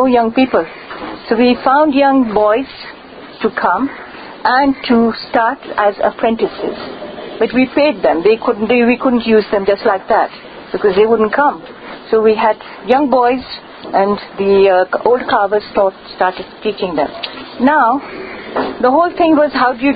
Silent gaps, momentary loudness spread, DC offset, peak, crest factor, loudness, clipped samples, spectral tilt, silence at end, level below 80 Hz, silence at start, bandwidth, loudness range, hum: none; 15 LU; under 0.1%; 0 dBFS; 14 dB; -13 LUFS; under 0.1%; -8.5 dB/octave; 0 s; -48 dBFS; 0 s; 5 kHz; 2 LU; none